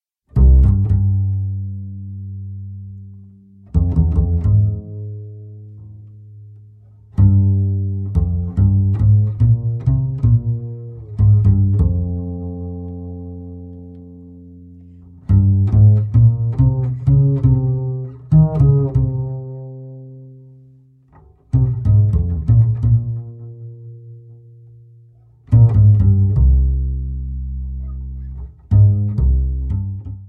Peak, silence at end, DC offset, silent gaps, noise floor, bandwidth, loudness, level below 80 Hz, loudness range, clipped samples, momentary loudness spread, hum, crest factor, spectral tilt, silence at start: -2 dBFS; 0 s; under 0.1%; none; -48 dBFS; 1.5 kHz; -16 LUFS; -24 dBFS; 7 LU; under 0.1%; 21 LU; none; 14 dB; -13 dB/octave; 0.35 s